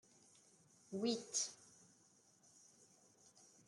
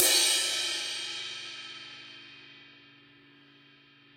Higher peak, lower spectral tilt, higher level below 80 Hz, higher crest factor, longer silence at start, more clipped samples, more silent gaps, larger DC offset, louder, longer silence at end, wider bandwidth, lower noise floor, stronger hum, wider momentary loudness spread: second, -28 dBFS vs -4 dBFS; first, -2.5 dB/octave vs 1.5 dB/octave; second, under -90 dBFS vs -76 dBFS; second, 22 dB vs 28 dB; first, 0.9 s vs 0 s; neither; neither; neither; second, -42 LUFS vs -28 LUFS; first, 2 s vs 1.45 s; second, 12 kHz vs 16.5 kHz; first, -72 dBFS vs -58 dBFS; neither; about the same, 26 LU vs 26 LU